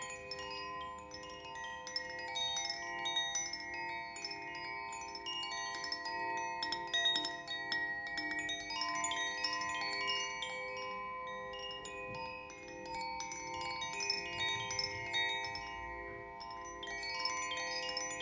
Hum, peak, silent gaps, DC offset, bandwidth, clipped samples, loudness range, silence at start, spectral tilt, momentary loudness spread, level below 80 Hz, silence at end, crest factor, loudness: none; -20 dBFS; none; under 0.1%; 7.8 kHz; under 0.1%; 5 LU; 0 s; -0.5 dB/octave; 10 LU; -66 dBFS; 0 s; 20 dB; -39 LUFS